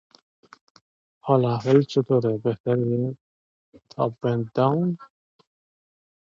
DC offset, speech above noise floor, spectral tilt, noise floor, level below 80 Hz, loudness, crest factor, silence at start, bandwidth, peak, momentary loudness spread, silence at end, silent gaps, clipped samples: under 0.1%; over 68 dB; -8.5 dB/octave; under -90 dBFS; -66 dBFS; -23 LUFS; 20 dB; 1.25 s; 7.4 kHz; -4 dBFS; 13 LU; 1.25 s; 2.60-2.64 s, 3.21-3.72 s; under 0.1%